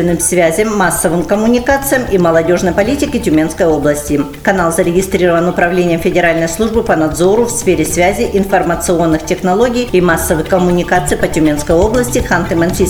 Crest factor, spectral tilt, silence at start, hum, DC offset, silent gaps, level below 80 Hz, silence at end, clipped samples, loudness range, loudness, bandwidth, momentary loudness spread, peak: 12 dB; -5 dB/octave; 0 s; none; 1%; none; -28 dBFS; 0 s; under 0.1%; 1 LU; -12 LUFS; over 20 kHz; 3 LU; 0 dBFS